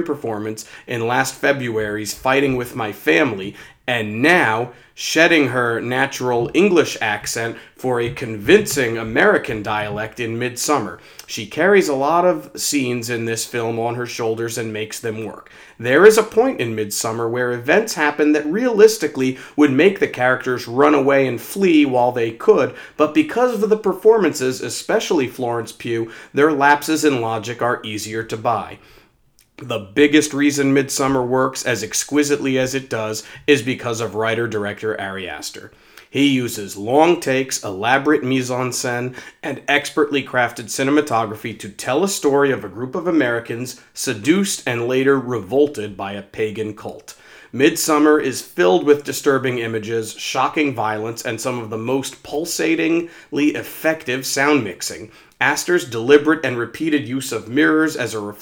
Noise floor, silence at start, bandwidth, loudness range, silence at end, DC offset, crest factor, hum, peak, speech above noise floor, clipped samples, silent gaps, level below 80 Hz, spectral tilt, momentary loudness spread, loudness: -57 dBFS; 0 s; over 20 kHz; 5 LU; 0 s; under 0.1%; 18 dB; none; 0 dBFS; 39 dB; under 0.1%; none; -56 dBFS; -4 dB/octave; 12 LU; -18 LUFS